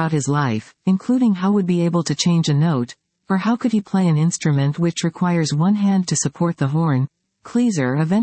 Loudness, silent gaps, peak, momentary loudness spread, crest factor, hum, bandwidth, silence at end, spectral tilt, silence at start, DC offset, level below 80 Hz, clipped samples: -19 LUFS; none; -6 dBFS; 5 LU; 12 dB; none; 8.8 kHz; 0 s; -6 dB/octave; 0 s; under 0.1%; -64 dBFS; under 0.1%